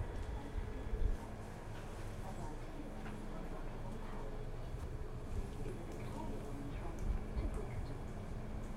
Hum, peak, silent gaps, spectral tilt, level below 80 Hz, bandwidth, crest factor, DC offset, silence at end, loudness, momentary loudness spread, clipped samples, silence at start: none; -24 dBFS; none; -7 dB/octave; -44 dBFS; 13 kHz; 18 dB; under 0.1%; 0 s; -46 LUFS; 5 LU; under 0.1%; 0 s